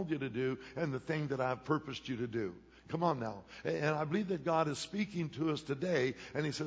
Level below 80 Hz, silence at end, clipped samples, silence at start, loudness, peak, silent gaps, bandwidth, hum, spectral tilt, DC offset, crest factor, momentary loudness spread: -66 dBFS; 0 s; under 0.1%; 0 s; -37 LUFS; -18 dBFS; none; 8 kHz; none; -6 dB/octave; under 0.1%; 18 dB; 7 LU